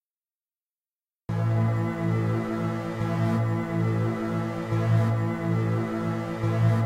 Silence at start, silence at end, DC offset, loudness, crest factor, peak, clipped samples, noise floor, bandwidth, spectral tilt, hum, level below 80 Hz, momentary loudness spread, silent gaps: 1.3 s; 0 s; under 0.1%; -27 LUFS; 14 dB; -12 dBFS; under 0.1%; under -90 dBFS; 9.2 kHz; -8.5 dB/octave; none; -54 dBFS; 6 LU; none